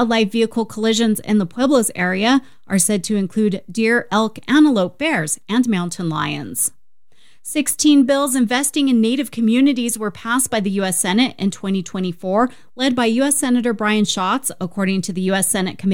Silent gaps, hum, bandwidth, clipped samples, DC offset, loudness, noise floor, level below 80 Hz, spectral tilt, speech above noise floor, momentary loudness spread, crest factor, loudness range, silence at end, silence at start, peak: none; none; 18 kHz; under 0.1%; 0.8%; -18 LUFS; -60 dBFS; -56 dBFS; -4 dB/octave; 43 dB; 7 LU; 16 dB; 2 LU; 0 s; 0 s; -2 dBFS